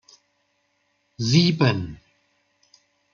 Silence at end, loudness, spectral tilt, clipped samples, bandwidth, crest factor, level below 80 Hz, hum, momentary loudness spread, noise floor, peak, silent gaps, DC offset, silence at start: 1.2 s; -21 LUFS; -5.5 dB/octave; under 0.1%; 7.4 kHz; 22 dB; -56 dBFS; 50 Hz at -45 dBFS; 13 LU; -70 dBFS; -4 dBFS; none; under 0.1%; 1.2 s